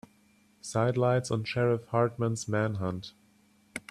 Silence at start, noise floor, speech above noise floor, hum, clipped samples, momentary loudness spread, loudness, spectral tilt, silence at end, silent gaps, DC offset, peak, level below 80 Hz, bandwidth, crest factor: 0.65 s; -64 dBFS; 35 dB; none; under 0.1%; 16 LU; -29 LUFS; -6 dB/octave; 0.1 s; none; under 0.1%; -12 dBFS; -64 dBFS; 12.5 kHz; 18 dB